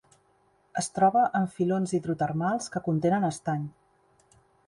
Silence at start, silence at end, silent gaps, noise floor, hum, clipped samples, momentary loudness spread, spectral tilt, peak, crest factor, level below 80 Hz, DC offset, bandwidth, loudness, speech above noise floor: 0.75 s; 1 s; none; -66 dBFS; none; under 0.1%; 10 LU; -6 dB/octave; -10 dBFS; 18 dB; -66 dBFS; under 0.1%; 11.5 kHz; -27 LUFS; 40 dB